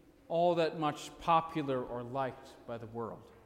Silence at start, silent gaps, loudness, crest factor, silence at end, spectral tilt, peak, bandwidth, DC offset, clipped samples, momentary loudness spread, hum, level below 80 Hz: 0.3 s; none; -34 LUFS; 18 dB; 0.05 s; -6 dB/octave; -16 dBFS; 15.5 kHz; under 0.1%; under 0.1%; 14 LU; none; -64 dBFS